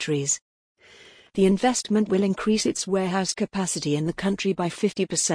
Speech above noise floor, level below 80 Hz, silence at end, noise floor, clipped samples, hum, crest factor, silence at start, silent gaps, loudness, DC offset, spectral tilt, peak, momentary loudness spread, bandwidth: 27 dB; -56 dBFS; 0 s; -51 dBFS; under 0.1%; none; 16 dB; 0 s; 0.41-0.75 s; -24 LUFS; under 0.1%; -4.5 dB/octave; -10 dBFS; 4 LU; 10.5 kHz